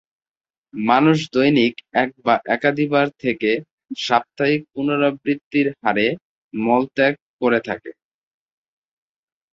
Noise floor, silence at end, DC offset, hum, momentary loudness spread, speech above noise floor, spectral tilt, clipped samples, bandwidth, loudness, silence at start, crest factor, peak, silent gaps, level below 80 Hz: under -90 dBFS; 1.6 s; under 0.1%; none; 10 LU; over 71 dB; -6 dB/octave; under 0.1%; 7.8 kHz; -19 LUFS; 0.75 s; 20 dB; -2 dBFS; 3.71-3.78 s, 5.44-5.51 s, 6.22-6.51 s, 7.22-7.39 s; -62 dBFS